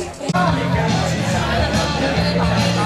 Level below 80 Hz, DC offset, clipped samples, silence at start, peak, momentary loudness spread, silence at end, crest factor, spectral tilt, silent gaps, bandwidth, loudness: -30 dBFS; under 0.1%; under 0.1%; 0 s; -4 dBFS; 2 LU; 0 s; 12 dB; -5.5 dB/octave; none; 13.5 kHz; -18 LUFS